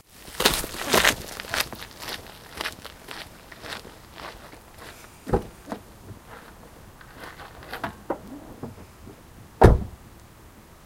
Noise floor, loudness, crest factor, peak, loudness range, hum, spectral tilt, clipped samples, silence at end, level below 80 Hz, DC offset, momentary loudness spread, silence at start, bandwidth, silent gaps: -49 dBFS; -25 LUFS; 28 dB; 0 dBFS; 13 LU; none; -4 dB/octave; under 0.1%; 0.9 s; -36 dBFS; under 0.1%; 26 LU; 0.2 s; 17 kHz; none